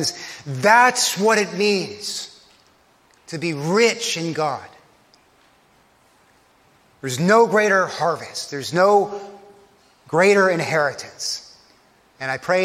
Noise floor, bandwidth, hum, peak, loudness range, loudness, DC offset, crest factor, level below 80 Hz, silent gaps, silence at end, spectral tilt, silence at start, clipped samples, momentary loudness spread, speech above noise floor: -57 dBFS; 16 kHz; none; -2 dBFS; 5 LU; -19 LUFS; under 0.1%; 20 dB; -68 dBFS; none; 0 s; -3.5 dB/octave; 0 s; under 0.1%; 16 LU; 38 dB